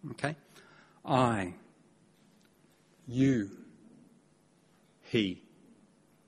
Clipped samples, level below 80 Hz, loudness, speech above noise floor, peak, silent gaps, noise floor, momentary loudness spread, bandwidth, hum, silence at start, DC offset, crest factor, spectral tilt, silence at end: under 0.1%; -66 dBFS; -32 LUFS; 36 dB; -12 dBFS; none; -66 dBFS; 22 LU; 11.5 kHz; none; 0.05 s; under 0.1%; 24 dB; -6.5 dB/octave; 0.9 s